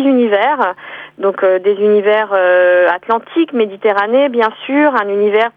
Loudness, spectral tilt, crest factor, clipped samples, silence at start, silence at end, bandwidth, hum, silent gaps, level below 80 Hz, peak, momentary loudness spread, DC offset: -13 LUFS; -7 dB/octave; 12 dB; under 0.1%; 0 s; 0.05 s; 5 kHz; none; none; -68 dBFS; -2 dBFS; 6 LU; under 0.1%